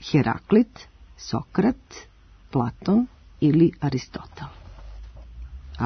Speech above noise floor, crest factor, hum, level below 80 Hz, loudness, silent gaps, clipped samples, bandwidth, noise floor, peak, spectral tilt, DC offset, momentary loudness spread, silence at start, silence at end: 18 dB; 18 dB; none; -46 dBFS; -23 LUFS; none; under 0.1%; 6.6 kHz; -40 dBFS; -6 dBFS; -7.5 dB/octave; under 0.1%; 24 LU; 0 s; 0 s